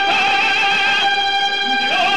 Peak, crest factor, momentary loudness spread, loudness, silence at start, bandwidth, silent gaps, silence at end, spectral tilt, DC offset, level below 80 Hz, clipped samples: -6 dBFS; 10 dB; 3 LU; -14 LUFS; 0 s; 12.5 kHz; none; 0 s; -1 dB/octave; 1%; -54 dBFS; under 0.1%